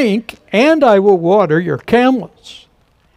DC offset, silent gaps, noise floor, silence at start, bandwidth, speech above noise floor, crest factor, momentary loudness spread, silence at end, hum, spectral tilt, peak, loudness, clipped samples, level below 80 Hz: under 0.1%; none; -54 dBFS; 0 s; 13.5 kHz; 42 dB; 12 dB; 10 LU; 0.65 s; none; -6.5 dB/octave; 0 dBFS; -12 LUFS; under 0.1%; -52 dBFS